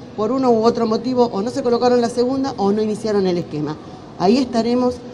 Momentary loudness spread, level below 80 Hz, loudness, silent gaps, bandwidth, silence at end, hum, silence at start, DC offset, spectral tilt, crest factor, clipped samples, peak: 8 LU; -54 dBFS; -18 LUFS; none; 11 kHz; 0 s; none; 0 s; under 0.1%; -6.5 dB/octave; 18 dB; under 0.1%; 0 dBFS